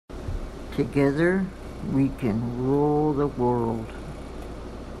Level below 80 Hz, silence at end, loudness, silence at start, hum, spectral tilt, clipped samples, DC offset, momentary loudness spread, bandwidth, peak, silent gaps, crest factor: -40 dBFS; 0 s; -25 LUFS; 0.1 s; none; -8.5 dB/octave; under 0.1%; under 0.1%; 16 LU; 12.5 kHz; -10 dBFS; none; 16 dB